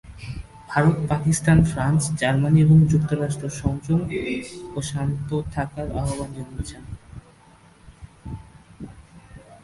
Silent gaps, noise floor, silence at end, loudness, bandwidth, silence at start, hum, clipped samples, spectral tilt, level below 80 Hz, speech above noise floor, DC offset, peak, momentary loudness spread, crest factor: none; -52 dBFS; 0.1 s; -22 LUFS; 11.5 kHz; 0.05 s; none; under 0.1%; -6.5 dB/octave; -40 dBFS; 31 dB; under 0.1%; -2 dBFS; 22 LU; 20 dB